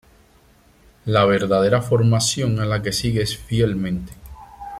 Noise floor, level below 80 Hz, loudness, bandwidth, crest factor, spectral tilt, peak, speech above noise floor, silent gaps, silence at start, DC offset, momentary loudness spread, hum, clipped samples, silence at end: -53 dBFS; -42 dBFS; -19 LUFS; 15 kHz; 18 dB; -5 dB/octave; -2 dBFS; 35 dB; none; 1.05 s; under 0.1%; 11 LU; none; under 0.1%; 0 s